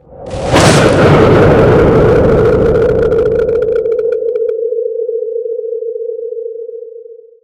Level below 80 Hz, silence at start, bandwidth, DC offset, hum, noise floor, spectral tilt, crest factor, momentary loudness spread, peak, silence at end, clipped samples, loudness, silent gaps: -26 dBFS; 0.1 s; 14 kHz; under 0.1%; none; -33 dBFS; -6 dB/octave; 10 dB; 15 LU; 0 dBFS; 0.3 s; 0.3%; -10 LUFS; none